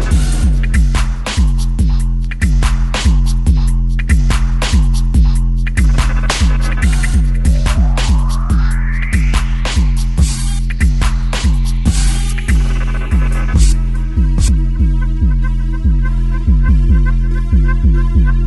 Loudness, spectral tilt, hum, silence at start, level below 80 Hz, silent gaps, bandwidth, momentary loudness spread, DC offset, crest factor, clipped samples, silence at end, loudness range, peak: -15 LUFS; -5.5 dB/octave; none; 0 s; -12 dBFS; none; 12 kHz; 4 LU; under 0.1%; 10 dB; under 0.1%; 0 s; 1 LU; 0 dBFS